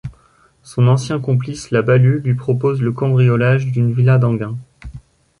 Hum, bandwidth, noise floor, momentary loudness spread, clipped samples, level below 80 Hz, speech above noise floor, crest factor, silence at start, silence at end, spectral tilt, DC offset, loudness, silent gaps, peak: none; 11 kHz; -53 dBFS; 16 LU; under 0.1%; -46 dBFS; 39 dB; 14 dB; 0.05 s; 0.4 s; -8 dB/octave; under 0.1%; -16 LUFS; none; -2 dBFS